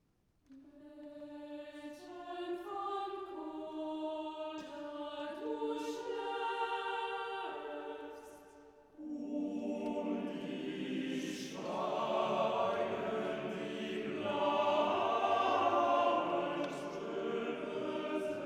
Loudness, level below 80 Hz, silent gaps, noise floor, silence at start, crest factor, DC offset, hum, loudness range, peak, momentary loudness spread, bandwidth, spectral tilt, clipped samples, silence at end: -37 LUFS; -76 dBFS; none; -74 dBFS; 0.5 s; 18 dB; under 0.1%; none; 10 LU; -20 dBFS; 16 LU; 15 kHz; -5 dB/octave; under 0.1%; 0 s